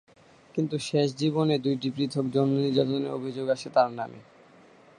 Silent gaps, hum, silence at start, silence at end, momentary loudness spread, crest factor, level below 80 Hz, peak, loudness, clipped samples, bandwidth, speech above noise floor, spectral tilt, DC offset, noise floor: none; none; 0.55 s; 0.75 s; 7 LU; 18 dB; -70 dBFS; -10 dBFS; -27 LUFS; under 0.1%; 11.5 kHz; 28 dB; -6.5 dB/octave; under 0.1%; -55 dBFS